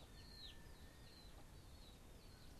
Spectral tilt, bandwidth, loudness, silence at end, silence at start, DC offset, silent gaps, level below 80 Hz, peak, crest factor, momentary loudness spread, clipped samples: -4 dB/octave; 13 kHz; -61 LUFS; 0 s; 0 s; under 0.1%; none; -62 dBFS; -44 dBFS; 14 dB; 5 LU; under 0.1%